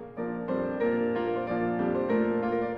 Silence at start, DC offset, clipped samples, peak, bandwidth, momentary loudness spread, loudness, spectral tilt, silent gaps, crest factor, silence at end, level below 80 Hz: 0 s; under 0.1%; under 0.1%; -16 dBFS; 5.2 kHz; 5 LU; -29 LUFS; -9.5 dB/octave; none; 12 dB; 0 s; -60 dBFS